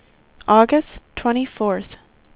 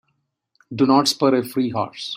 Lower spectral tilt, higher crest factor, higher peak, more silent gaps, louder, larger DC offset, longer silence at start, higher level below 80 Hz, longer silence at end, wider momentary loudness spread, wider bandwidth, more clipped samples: first, -10 dB/octave vs -4.5 dB/octave; about the same, 20 dB vs 18 dB; first, 0 dBFS vs -4 dBFS; neither; about the same, -19 LUFS vs -19 LUFS; neither; second, 0.5 s vs 0.7 s; first, -48 dBFS vs -64 dBFS; first, 0.4 s vs 0 s; first, 18 LU vs 9 LU; second, 4 kHz vs 16 kHz; neither